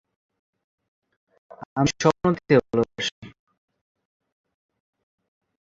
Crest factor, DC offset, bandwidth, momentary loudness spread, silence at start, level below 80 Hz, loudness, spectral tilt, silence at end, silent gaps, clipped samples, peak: 24 dB; under 0.1%; 7.8 kHz; 10 LU; 1.6 s; -56 dBFS; -23 LUFS; -5.5 dB/octave; 2.3 s; 1.66-1.76 s, 3.12-3.22 s; under 0.1%; -4 dBFS